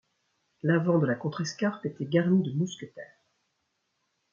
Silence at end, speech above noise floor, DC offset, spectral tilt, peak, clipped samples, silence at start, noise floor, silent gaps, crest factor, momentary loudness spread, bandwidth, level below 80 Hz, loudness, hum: 1.3 s; 51 dB; under 0.1%; -7 dB/octave; -10 dBFS; under 0.1%; 0.65 s; -78 dBFS; none; 20 dB; 14 LU; 7.4 kHz; -74 dBFS; -28 LUFS; none